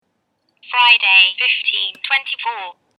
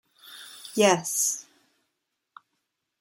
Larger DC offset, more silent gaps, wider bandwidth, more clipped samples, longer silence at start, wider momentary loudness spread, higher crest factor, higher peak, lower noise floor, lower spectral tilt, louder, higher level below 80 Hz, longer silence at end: neither; neither; second, 12 kHz vs 17 kHz; neither; first, 0.7 s vs 0.25 s; second, 14 LU vs 22 LU; second, 18 dB vs 24 dB; first, 0 dBFS vs -6 dBFS; second, -68 dBFS vs -81 dBFS; second, 2 dB/octave vs -2.5 dB/octave; first, -13 LUFS vs -24 LUFS; second, -88 dBFS vs -78 dBFS; second, 0.3 s vs 1.6 s